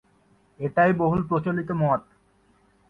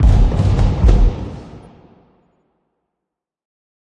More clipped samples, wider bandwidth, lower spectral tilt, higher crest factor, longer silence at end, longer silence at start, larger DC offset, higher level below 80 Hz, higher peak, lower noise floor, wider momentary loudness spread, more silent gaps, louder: neither; second, 4.7 kHz vs 7.6 kHz; first, -10 dB/octave vs -8 dB/octave; about the same, 18 dB vs 16 dB; second, 0.9 s vs 2.4 s; first, 0.6 s vs 0 s; neither; second, -54 dBFS vs -18 dBFS; second, -8 dBFS vs -2 dBFS; second, -62 dBFS vs -82 dBFS; second, 7 LU vs 19 LU; neither; second, -24 LUFS vs -16 LUFS